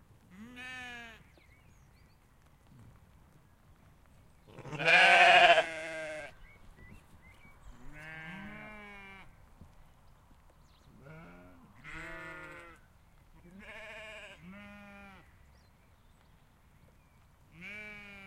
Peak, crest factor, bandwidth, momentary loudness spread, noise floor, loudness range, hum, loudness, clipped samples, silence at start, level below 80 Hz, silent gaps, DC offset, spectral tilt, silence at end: -10 dBFS; 26 dB; 13 kHz; 31 LU; -63 dBFS; 25 LU; none; -24 LUFS; under 0.1%; 0.4 s; -62 dBFS; none; under 0.1%; -2.5 dB/octave; 0.25 s